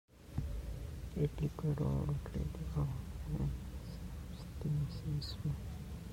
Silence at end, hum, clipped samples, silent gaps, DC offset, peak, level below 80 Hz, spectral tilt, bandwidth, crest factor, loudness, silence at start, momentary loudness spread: 0 s; none; under 0.1%; none; under 0.1%; -22 dBFS; -46 dBFS; -7.5 dB/octave; 16.5 kHz; 16 dB; -41 LUFS; 0.15 s; 10 LU